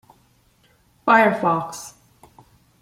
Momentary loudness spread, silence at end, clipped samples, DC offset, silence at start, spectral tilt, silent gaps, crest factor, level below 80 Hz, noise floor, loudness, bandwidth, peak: 20 LU; 0.9 s; under 0.1%; under 0.1%; 1.05 s; -5 dB/octave; none; 22 dB; -64 dBFS; -59 dBFS; -18 LUFS; 16 kHz; -2 dBFS